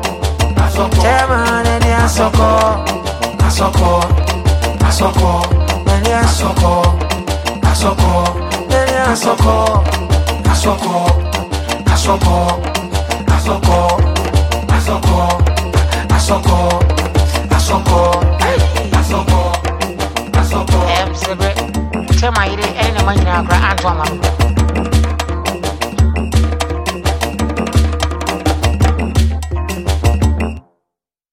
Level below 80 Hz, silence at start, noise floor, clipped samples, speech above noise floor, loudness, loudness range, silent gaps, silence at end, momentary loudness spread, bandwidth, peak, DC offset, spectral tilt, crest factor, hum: -16 dBFS; 0 s; -79 dBFS; under 0.1%; 67 dB; -14 LUFS; 3 LU; none; 0.75 s; 6 LU; 15.5 kHz; 0 dBFS; under 0.1%; -5 dB/octave; 12 dB; none